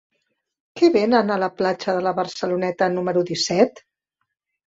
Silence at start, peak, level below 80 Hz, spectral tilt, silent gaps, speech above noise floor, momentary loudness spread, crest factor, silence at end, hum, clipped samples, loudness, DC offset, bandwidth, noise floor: 0.75 s; -2 dBFS; -64 dBFS; -5 dB/octave; none; 54 dB; 6 LU; 20 dB; 0.95 s; none; under 0.1%; -20 LUFS; under 0.1%; 7.8 kHz; -73 dBFS